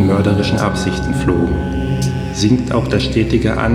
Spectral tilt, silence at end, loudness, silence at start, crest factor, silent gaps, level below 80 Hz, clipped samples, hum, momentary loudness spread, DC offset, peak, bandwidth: -6.5 dB/octave; 0 s; -16 LUFS; 0 s; 14 dB; none; -28 dBFS; under 0.1%; none; 4 LU; under 0.1%; 0 dBFS; 14 kHz